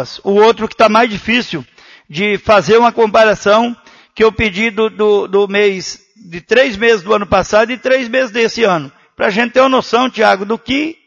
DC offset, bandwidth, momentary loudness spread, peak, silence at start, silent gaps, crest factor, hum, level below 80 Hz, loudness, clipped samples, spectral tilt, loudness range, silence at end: under 0.1%; 7.6 kHz; 10 LU; 0 dBFS; 0 s; none; 12 dB; none; -42 dBFS; -12 LUFS; under 0.1%; -4.5 dB/octave; 2 LU; 0.15 s